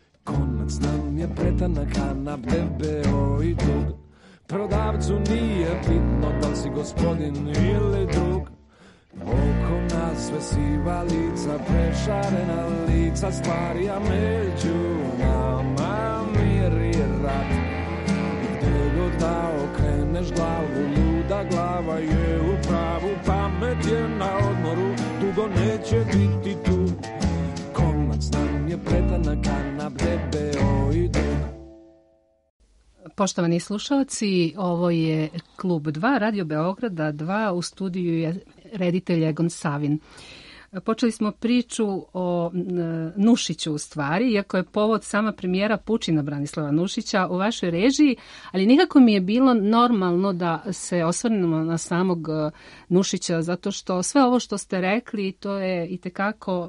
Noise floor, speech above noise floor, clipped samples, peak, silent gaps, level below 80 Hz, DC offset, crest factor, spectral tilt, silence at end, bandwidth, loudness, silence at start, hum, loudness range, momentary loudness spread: -61 dBFS; 39 dB; under 0.1%; -6 dBFS; 32.50-32.60 s; -32 dBFS; under 0.1%; 18 dB; -6.5 dB/octave; 0 s; 11.5 kHz; -24 LUFS; 0.25 s; none; 5 LU; 6 LU